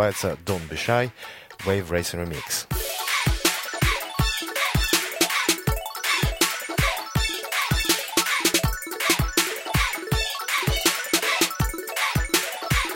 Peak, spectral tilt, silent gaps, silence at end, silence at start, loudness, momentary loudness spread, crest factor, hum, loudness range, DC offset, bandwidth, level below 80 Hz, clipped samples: -6 dBFS; -3 dB/octave; none; 0 s; 0 s; -23 LUFS; 7 LU; 18 dB; none; 3 LU; under 0.1%; 17 kHz; -34 dBFS; under 0.1%